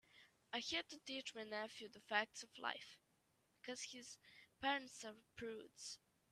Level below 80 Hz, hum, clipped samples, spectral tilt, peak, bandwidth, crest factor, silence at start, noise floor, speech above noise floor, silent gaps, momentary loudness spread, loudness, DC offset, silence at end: -84 dBFS; none; under 0.1%; -1.5 dB/octave; -24 dBFS; 13.5 kHz; 26 dB; 0.15 s; -81 dBFS; 32 dB; none; 17 LU; -48 LUFS; under 0.1%; 0.35 s